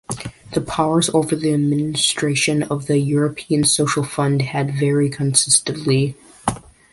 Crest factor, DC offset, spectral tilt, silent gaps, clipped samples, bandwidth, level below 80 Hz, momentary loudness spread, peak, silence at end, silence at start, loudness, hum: 18 dB; under 0.1%; -4 dB/octave; none; under 0.1%; 11.5 kHz; -50 dBFS; 10 LU; -2 dBFS; 0.35 s; 0.1 s; -18 LUFS; none